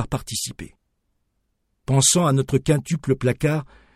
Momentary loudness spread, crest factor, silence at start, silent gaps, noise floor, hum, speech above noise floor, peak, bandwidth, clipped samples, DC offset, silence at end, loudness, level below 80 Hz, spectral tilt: 13 LU; 18 dB; 0 s; none; -72 dBFS; none; 51 dB; -4 dBFS; 15.5 kHz; under 0.1%; under 0.1%; 0.3 s; -21 LUFS; -46 dBFS; -4.5 dB/octave